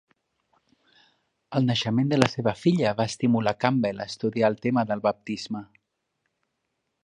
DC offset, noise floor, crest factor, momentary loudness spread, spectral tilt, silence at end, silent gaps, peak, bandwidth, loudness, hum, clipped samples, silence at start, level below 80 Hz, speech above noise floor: under 0.1%; -78 dBFS; 26 dB; 9 LU; -6 dB/octave; 1.4 s; none; 0 dBFS; 11 kHz; -25 LUFS; none; under 0.1%; 1.5 s; -62 dBFS; 54 dB